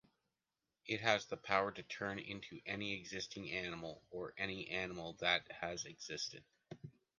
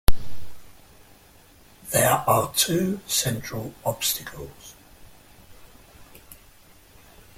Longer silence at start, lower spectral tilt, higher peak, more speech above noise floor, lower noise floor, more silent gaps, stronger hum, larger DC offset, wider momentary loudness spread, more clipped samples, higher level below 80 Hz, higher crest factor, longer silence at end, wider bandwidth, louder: first, 0.85 s vs 0.1 s; about the same, -3 dB/octave vs -3 dB/octave; second, -16 dBFS vs -2 dBFS; first, over 48 dB vs 28 dB; first, under -90 dBFS vs -53 dBFS; neither; neither; neither; second, 13 LU vs 25 LU; neither; second, -72 dBFS vs -36 dBFS; first, 28 dB vs 22 dB; second, 0.3 s vs 1.85 s; second, 10 kHz vs 16.5 kHz; second, -41 LUFS vs -23 LUFS